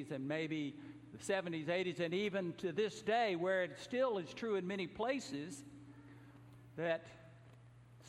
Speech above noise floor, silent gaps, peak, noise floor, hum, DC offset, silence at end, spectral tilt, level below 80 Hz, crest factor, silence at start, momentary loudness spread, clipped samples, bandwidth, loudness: 21 dB; none; -24 dBFS; -60 dBFS; none; under 0.1%; 0 s; -5 dB/octave; -76 dBFS; 18 dB; 0 s; 22 LU; under 0.1%; 13 kHz; -39 LUFS